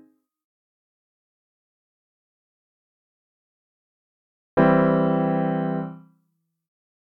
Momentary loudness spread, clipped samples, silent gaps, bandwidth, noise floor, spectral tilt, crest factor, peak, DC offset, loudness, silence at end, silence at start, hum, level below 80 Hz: 11 LU; under 0.1%; none; 4.3 kHz; -73 dBFS; -11 dB/octave; 22 dB; -4 dBFS; under 0.1%; -21 LUFS; 1.15 s; 4.55 s; none; -62 dBFS